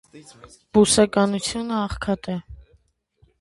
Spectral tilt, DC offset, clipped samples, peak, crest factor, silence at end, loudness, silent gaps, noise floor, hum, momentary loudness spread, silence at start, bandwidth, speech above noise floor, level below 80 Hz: -4 dB/octave; under 0.1%; under 0.1%; -4 dBFS; 20 dB; 0.85 s; -21 LUFS; none; -62 dBFS; none; 11 LU; 0.15 s; 11.5 kHz; 40 dB; -44 dBFS